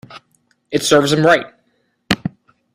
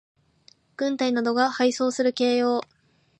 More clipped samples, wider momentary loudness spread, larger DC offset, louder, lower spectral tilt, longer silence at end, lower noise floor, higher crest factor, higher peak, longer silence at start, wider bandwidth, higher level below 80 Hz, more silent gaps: neither; first, 14 LU vs 7 LU; neither; first, -15 LUFS vs -23 LUFS; about the same, -4 dB/octave vs -3 dB/octave; about the same, 0.45 s vs 0.55 s; first, -64 dBFS vs -59 dBFS; about the same, 18 dB vs 18 dB; first, 0 dBFS vs -8 dBFS; second, 0.1 s vs 0.8 s; first, 16 kHz vs 9 kHz; first, -50 dBFS vs -76 dBFS; neither